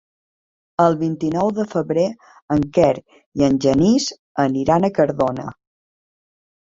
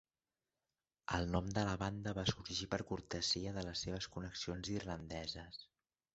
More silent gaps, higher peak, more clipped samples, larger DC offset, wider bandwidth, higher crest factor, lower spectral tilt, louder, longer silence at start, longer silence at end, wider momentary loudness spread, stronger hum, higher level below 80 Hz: first, 2.42-2.48 s, 3.26-3.32 s, 4.19-4.35 s vs none; first, -2 dBFS vs -20 dBFS; neither; neither; about the same, 7.8 kHz vs 8 kHz; about the same, 18 dB vs 22 dB; first, -6.5 dB/octave vs -4 dB/octave; first, -19 LUFS vs -41 LUFS; second, 0.8 s vs 1.1 s; first, 1.15 s vs 0.5 s; about the same, 9 LU vs 8 LU; neither; first, -50 dBFS vs -56 dBFS